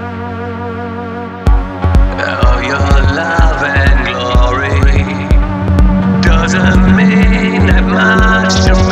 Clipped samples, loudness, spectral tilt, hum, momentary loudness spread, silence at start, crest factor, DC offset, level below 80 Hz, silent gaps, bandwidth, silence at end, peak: under 0.1%; -11 LUFS; -6 dB/octave; none; 12 LU; 0 s; 10 dB; under 0.1%; -14 dBFS; none; 8.4 kHz; 0 s; 0 dBFS